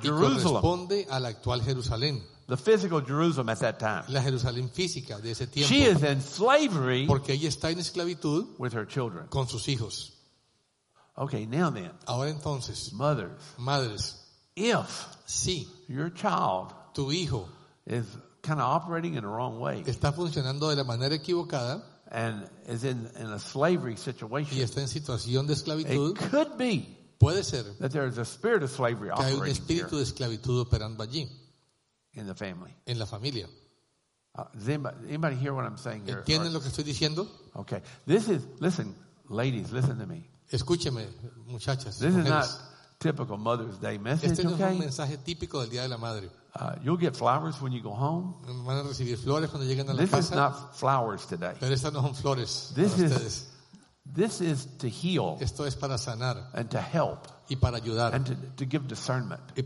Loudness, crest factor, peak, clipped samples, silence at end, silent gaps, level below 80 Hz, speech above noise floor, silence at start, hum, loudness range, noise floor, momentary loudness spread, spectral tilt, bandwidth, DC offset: -30 LUFS; 24 dB; -6 dBFS; under 0.1%; 0 s; none; -52 dBFS; 46 dB; 0 s; none; 6 LU; -75 dBFS; 12 LU; -5.5 dB/octave; 11.5 kHz; under 0.1%